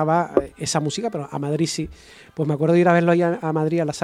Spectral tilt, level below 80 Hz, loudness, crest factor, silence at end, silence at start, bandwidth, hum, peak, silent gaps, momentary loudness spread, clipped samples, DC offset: -6 dB/octave; -52 dBFS; -21 LUFS; 20 dB; 0 s; 0 s; 12.5 kHz; none; 0 dBFS; none; 11 LU; under 0.1%; under 0.1%